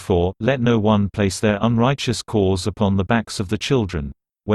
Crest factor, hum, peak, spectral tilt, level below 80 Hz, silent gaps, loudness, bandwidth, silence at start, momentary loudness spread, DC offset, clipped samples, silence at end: 16 dB; none; -4 dBFS; -6 dB/octave; -40 dBFS; none; -20 LUFS; 12.5 kHz; 0 s; 7 LU; under 0.1%; under 0.1%; 0 s